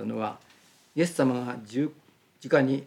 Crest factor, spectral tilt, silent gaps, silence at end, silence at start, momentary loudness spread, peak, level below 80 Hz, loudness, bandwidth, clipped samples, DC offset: 20 dB; -6.5 dB/octave; none; 0 s; 0 s; 11 LU; -8 dBFS; -80 dBFS; -28 LUFS; 14 kHz; under 0.1%; under 0.1%